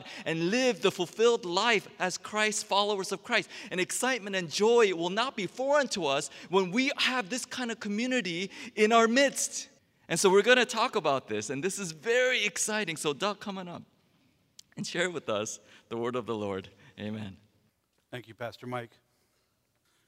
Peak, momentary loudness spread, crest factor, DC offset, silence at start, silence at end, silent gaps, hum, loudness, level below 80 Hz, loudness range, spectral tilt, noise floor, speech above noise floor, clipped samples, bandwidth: -8 dBFS; 16 LU; 22 dB; under 0.1%; 0 s; 1.2 s; none; none; -28 LUFS; -78 dBFS; 11 LU; -3 dB/octave; -74 dBFS; 45 dB; under 0.1%; 16 kHz